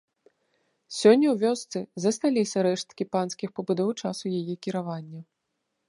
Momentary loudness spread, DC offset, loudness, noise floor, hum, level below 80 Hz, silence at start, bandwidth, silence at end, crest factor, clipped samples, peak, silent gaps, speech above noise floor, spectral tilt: 15 LU; under 0.1%; -26 LUFS; -80 dBFS; none; -78 dBFS; 0.9 s; 11.5 kHz; 0.65 s; 22 dB; under 0.1%; -6 dBFS; none; 54 dB; -5.5 dB/octave